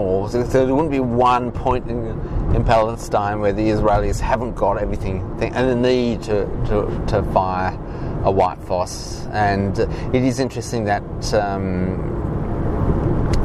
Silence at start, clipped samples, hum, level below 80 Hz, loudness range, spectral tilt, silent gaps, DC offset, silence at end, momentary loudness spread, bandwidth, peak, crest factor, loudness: 0 s; under 0.1%; none; -28 dBFS; 2 LU; -7 dB/octave; none; under 0.1%; 0 s; 7 LU; 13.5 kHz; 0 dBFS; 18 dB; -20 LUFS